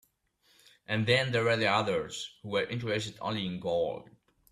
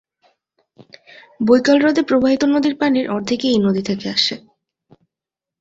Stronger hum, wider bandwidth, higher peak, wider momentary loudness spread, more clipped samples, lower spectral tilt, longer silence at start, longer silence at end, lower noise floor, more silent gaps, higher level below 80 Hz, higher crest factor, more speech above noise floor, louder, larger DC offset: neither; first, 13.5 kHz vs 7.8 kHz; second, -14 dBFS vs -2 dBFS; about the same, 9 LU vs 7 LU; neither; about the same, -5 dB/octave vs -5 dB/octave; second, 0.9 s vs 1.4 s; second, 0.5 s vs 1.25 s; second, -70 dBFS vs -87 dBFS; neither; second, -66 dBFS vs -56 dBFS; about the same, 18 dB vs 18 dB; second, 40 dB vs 71 dB; second, -30 LUFS vs -16 LUFS; neither